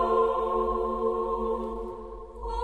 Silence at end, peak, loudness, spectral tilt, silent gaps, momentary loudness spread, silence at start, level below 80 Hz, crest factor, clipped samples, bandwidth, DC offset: 0 s; -12 dBFS; -28 LUFS; -7.5 dB/octave; none; 14 LU; 0 s; -42 dBFS; 16 dB; under 0.1%; 8.6 kHz; 0.2%